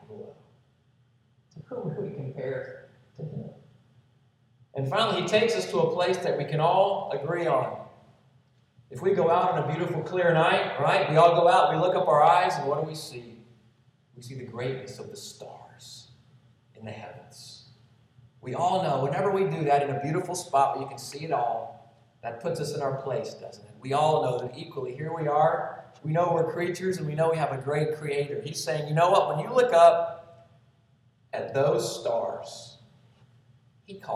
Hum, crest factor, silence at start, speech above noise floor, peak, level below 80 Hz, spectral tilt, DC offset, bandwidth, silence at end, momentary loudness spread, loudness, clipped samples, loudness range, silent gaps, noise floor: none; 22 dB; 0.1 s; 39 dB; -6 dBFS; -72 dBFS; -5.5 dB/octave; under 0.1%; 14 kHz; 0 s; 22 LU; -26 LUFS; under 0.1%; 16 LU; none; -64 dBFS